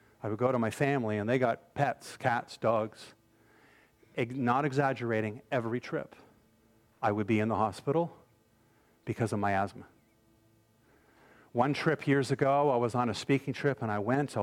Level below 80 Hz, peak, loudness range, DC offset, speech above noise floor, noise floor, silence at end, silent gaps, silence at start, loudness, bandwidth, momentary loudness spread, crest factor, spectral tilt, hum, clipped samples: -70 dBFS; -12 dBFS; 5 LU; under 0.1%; 36 dB; -66 dBFS; 0 s; none; 0.25 s; -31 LUFS; 15.5 kHz; 10 LU; 20 dB; -6.5 dB/octave; none; under 0.1%